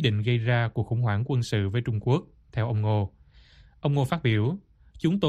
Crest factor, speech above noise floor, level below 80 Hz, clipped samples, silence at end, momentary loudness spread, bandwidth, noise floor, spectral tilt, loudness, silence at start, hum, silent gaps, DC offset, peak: 18 dB; 29 dB; -52 dBFS; under 0.1%; 0 s; 6 LU; 11.5 kHz; -54 dBFS; -7.5 dB/octave; -27 LUFS; 0 s; none; none; under 0.1%; -8 dBFS